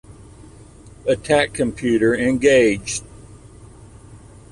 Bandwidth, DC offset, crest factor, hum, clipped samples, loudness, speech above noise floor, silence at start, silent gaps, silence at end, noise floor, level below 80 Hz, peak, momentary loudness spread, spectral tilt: 11.5 kHz; under 0.1%; 18 dB; none; under 0.1%; -18 LUFS; 26 dB; 0.1 s; none; 0.35 s; -43 dBFS; -44 dBFS; -4 dBFS; 12 LU; -4.5 dB/octave